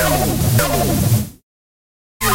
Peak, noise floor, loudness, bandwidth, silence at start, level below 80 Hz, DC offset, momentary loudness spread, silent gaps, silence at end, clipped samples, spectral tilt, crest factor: -4 dBFS; under -90 dBFS; -17 LUFS; 16 kHz; 0 s; -30 dBFS; under 0.1%; 5 LU; 1.43-2.20 s; 0 s; under 0.1%; -4.5 dB/octave; 14 dB